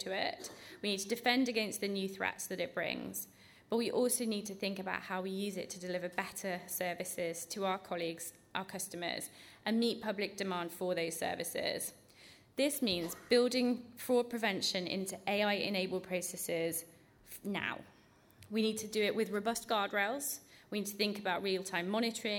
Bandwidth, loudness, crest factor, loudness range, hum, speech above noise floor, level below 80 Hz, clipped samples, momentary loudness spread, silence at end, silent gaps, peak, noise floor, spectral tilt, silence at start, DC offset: 19 kHz; -36 LUFS; 20 dB; 5 LU; none; 27 dB; -76 dBFS; under 0.1%; 9 LU; 0 s; none; -16 dBFS; -63 dBFS; -3 dB/octave; 0 s; under 0.1%